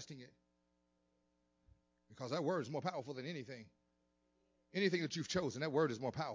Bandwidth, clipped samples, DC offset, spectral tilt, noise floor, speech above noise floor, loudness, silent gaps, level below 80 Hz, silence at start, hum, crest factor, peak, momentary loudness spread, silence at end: 7.6 kHz; under 0.1%; under 0.1%; -5 dB/octave; -81 dBFS; 41 dB; -40 LUFS; none; -74 dBFS; 0 s; none; 20 dB; -22 dBFS; 15 LU; 0 s